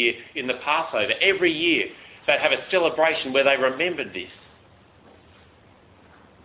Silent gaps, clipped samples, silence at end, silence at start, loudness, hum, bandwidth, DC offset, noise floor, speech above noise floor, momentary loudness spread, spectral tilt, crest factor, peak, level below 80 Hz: none; under 0.1%; 2.1 s; 0 s; -22 LUFS; none; 4 kHz; under 0.1%; -53 dBFS; 31 dB; 11 LU; -7 dB/octave; 20 dB; -4 dBFS; -62 dBFS